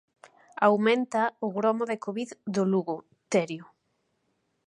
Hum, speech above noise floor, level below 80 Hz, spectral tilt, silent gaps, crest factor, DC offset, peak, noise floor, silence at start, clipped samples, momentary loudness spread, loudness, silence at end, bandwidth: none; 49 dB; -80 dBFS; -6 dB/octave; none; 22 dB; under 0.1%; -8 dBFS; -75 dBFS; 0.6 s; under 0.1%; 13 LU; -27 LUFS; 1.05 s; 11 kHz